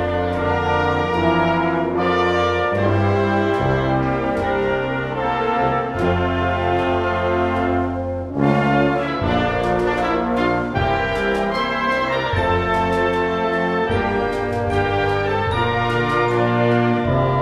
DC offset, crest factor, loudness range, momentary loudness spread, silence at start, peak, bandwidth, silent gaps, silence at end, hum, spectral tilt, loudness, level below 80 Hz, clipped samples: under 0.1%; 16 dB; 1 LU; 3 LU; 0 s; -4 dBFS; 12 kHz; none; 0 s; none; -7 dB/octave; -19 LUFS; -38 dBFS; under 0.1%